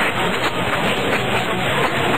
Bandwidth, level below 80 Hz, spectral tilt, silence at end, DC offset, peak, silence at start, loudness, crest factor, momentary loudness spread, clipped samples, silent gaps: 15.5 kHz; -42 dBFS; -4 dB/octave; 0 s; 3%; -6 dBFS; 0 s; -19 LUFS; 12 dB; 1 LU; under 0.1%; none